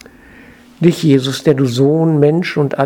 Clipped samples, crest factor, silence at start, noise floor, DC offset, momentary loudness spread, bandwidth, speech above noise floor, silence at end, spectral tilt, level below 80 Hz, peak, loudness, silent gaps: 0.1%; 14 dB; 0.8 s; -41 dBFS; under 0.1%; 4 LU; 16.5 kHz; 28 dB; 0 s; -7 dB/octave; -52 dBFS; 0 dBFS; -13 LUFS; none